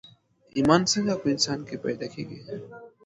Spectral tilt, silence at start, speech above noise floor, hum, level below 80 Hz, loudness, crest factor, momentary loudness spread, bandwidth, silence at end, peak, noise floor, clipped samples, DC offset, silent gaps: -4 dB/octave; 0.55 s; 30 dB; none; -60 dBFS; -25 LUFS; 22 dB; 18 LU; 10.5 kHz; 0.2 s; -4 dBFS; -56 dBFS; under 0.1%; under 0.1%; none